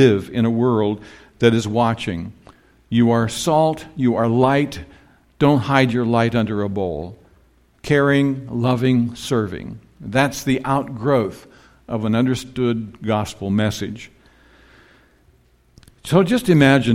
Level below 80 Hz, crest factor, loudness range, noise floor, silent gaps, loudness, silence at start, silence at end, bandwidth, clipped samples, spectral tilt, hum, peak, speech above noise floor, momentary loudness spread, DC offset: -48 dBFS; 18 dB; 5 LU; -55 dBFS; none; -19 LUFS; 0 s; 0 s; 16 kHz; under 0.1%; -6.5 dB/octave; none; 0 dBFS; 38 dB; 13 LU; under 0.1%